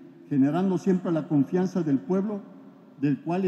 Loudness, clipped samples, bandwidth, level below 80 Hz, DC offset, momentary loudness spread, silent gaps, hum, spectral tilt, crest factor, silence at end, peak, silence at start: -26 LUFS; under 0.1%; 8.2 kHz; -80 dBFS; under 0.1%; 6 LU; none; none; -9 dB/octave; 14 dB; 0 s; -12 dBFS; 0 s